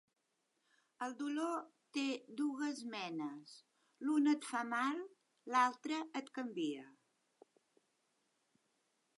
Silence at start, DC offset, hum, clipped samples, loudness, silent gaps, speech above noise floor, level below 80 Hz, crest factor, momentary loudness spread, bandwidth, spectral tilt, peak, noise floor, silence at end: 1 s; under 0.1%; none; under 0.1%; -40 LUFS; none; 45 dB; under -90 dBFS; 20 dB; 12 LU; 11.5 kHz; -3.5 dB/octave; -20 dBFS; -84 dBFS; 2.25 s